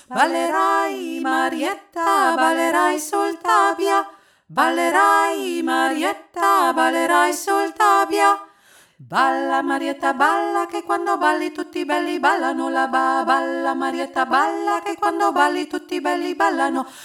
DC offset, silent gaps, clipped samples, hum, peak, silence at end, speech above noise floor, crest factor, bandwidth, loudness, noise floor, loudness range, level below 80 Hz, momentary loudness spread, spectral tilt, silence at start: under 0.1%; none; under 0.1%; none; -2 dBFS; 0 s; 33 dB; 18 dB; 17.5 kHz; -19 LUFS; -52 dBFS; 2 LU; -72 dBFS; 7 LU; -2 dB/octave; 0.1 s